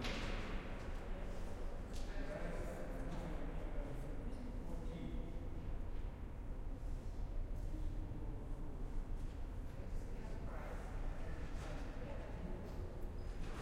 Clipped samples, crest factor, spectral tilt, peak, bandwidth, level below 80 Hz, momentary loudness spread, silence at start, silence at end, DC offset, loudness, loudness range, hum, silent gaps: under 0.1%; 14 dB; -6.5 dB/octave; -30 dBFS; 11.5 kHz; -44 dBFS; 3 LU; 0 s; 0 s; under 0.1%; -49 LUFS; 1 LU; none; none